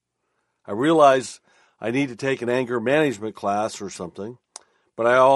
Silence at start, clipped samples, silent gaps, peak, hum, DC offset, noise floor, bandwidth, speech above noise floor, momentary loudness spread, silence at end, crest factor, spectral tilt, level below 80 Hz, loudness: 0.7 s; under 0.1%; none; -2 dBFS; none; under 0.1%; -74 dBFS; 11.5 kHz; 54 dB; 20 LU; 0 s; 20 dB; -5 dB/octave; -66 dBFS; -21 LUFS